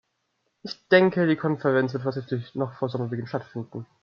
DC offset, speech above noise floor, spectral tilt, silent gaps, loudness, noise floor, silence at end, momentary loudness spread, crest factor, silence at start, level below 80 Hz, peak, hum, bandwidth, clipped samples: under 0.1%; 50 dB; -8 dB/octave; none; -25 LUFS; -75 dBFS; 0.2 s; 18 LU; 22 dB; 0.65 s; -72 dBFS; -4 dBFS; none; 6.8 kHz; under 0.1%